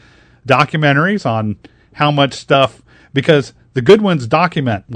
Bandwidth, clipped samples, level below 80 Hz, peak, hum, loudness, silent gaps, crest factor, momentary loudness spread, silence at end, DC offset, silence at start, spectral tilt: 11 kHz; 0.5%; -50 dBFS; 0 dBFS; none; -14 LUFS; none; 14 dB; 10 LU; 0 s; under 0.1%; 0.45 s; -6.5 dB/octave